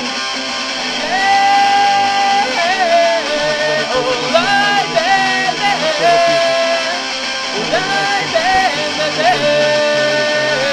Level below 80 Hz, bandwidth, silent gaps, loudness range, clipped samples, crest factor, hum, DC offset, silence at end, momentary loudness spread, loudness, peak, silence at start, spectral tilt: -50 dBFS; 13.5 kHz; none; 1 LU; under 0.1%; 14 dB; none; under 0.1%; 0 s; 6 LU; -13 LUFS; 0 dBFS; 0 s; -2 dB/octave